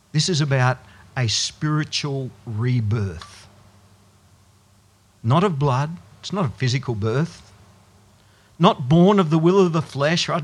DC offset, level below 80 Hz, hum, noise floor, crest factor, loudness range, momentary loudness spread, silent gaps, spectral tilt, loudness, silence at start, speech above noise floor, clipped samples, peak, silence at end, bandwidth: under 0.1%; -56 dBFS; none; -56 dBFS; 20 dB; 7 LU; 13 LU; none; -5.5 dB/octave; -21 LUFS; 0.15 s; 36 dB; under 0.1%; 0 dBFS; 0 s; 11 kHz